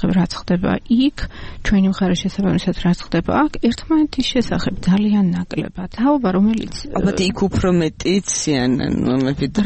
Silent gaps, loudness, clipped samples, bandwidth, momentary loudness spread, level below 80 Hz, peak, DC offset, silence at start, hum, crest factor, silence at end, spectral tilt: none; -18 LUFS; under 0.1%; 8.8 kHz; 5 LU; -34 dBFS; -6 dBFS; under 0.1%; 0 s; none; 12 dB; 0 s; -5.5 dB/octave